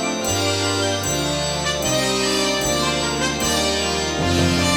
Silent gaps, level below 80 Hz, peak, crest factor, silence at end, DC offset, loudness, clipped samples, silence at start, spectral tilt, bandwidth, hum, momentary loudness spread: none; -38 dBFS; -6 dBFS; 14 dB; 0 s; under 0.1%; -19 LUFS; under 0.1%; 0 s; -3 dB/octave; 18 kHz; none; 2 LU